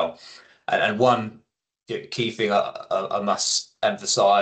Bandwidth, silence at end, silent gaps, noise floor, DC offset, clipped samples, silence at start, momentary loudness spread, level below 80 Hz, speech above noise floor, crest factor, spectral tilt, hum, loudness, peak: 9.2 kHz; 0 s; none; -48 dBFS; under 0.1%; under 0.1%; 0 s; 14 LU; -70 dBFS; 25 dB; 18 dB; -3 dB/octave; none; -23 LUFS; -6 dBFS